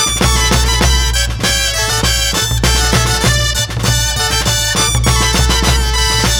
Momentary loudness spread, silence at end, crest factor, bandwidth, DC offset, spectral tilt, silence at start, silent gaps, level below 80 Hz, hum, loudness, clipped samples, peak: 2 LU; 0 s; 12 dB; 19.5 kHz; under 0.1%; -2.5 dB/octave; 0 s; none; -18 dBFS; none; -12 LUFS; under 0.1%; 0 dBFS